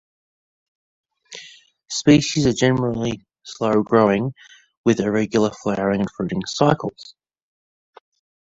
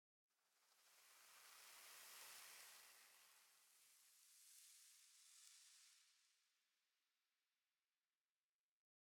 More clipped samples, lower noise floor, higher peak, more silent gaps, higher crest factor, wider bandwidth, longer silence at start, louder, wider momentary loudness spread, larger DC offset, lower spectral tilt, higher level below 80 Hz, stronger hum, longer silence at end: neither; second, -47 dBFS vs under -90 dBFS; first, -2 dBFS vs -46 dBFS; first, 4.77-4.84 s vs none; about the same, 20 dB vs 24 dB; second, 8 kHz vs 18 kHz; first, 1.3 s vs 0.3 s; first, -20 LUFS vs -64 LUFS; first, 17 LU vs 9 LU; neither; first, -5.5 dB/octave vs 3 dB/octave; first, -52 dBFS vs under -90 dBFS; neither; second, 1.5 s vs 2 s